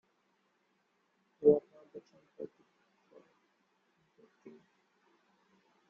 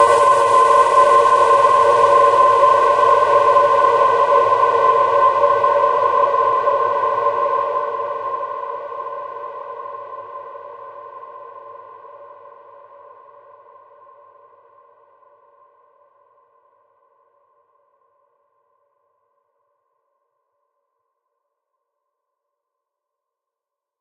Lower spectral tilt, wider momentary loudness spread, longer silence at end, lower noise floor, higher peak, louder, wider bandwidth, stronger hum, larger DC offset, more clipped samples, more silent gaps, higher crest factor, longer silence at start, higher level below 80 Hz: first, -9.5 dB/octave vs -3 dB/octave; first, 26 LU vs 22 LU; second, 1.4 s vs 11.75 s; second, -77 dBFS vs -86 dBFS; second, -12 dBFS vs -2 dBFS; second, -30 LUFS vs -14 LUFS; second, 3.3 kHz vs 11 kHz; neither; neither; neither; neither; first, 26 dB vs 16 dB; first, 1.4 s vs 0 s; second, -80 dBFS vs -62 dBFS